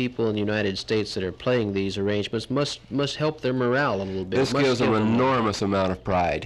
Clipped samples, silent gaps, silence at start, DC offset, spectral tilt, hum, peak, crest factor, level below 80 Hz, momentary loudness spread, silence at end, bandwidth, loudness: under 0.1%; none; 0 s; under 0.1%; -6 dB/octave; none; -12 dBFS; 12 dB; -52 dBFS; 6 LU; 0 s; 12 kHz; -24 LUFS